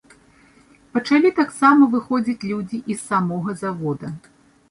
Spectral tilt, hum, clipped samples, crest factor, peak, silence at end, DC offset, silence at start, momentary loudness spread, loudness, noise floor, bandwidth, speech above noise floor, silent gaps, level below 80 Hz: -6 dB/octave; none; under 0.1%; 18 dB; -2 dBFS; 0.55 s; under 0.1%; 0.95 s; 13 LU; -20 LUFS; -53 dBFS; 11.5 kHz; 34 dB; none; -62 dBFS